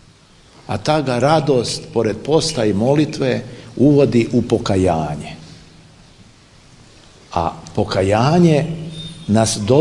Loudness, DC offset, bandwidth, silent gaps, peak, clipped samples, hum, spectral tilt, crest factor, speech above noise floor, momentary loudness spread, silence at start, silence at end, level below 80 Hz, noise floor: -17 LUFS; under 0.1%; 11.5 kHz; none; 0 dBFS; under 0.1%; none; -6 dB/octave; 16 dB; 32 dB; 13 LU; 0.7 s; 0 s; -44 dBFS; -47 dBFS